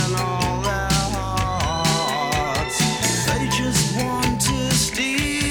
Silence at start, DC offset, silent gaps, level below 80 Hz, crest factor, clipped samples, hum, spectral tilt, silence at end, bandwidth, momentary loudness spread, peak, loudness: 0 s; 0.2%; none; -34 dBFS; 16 dB; under 0.1%; none; -3.5 dB/octave; 0 s; over 20 kHz; 3 LU; -6 dBFS; -20 LUFS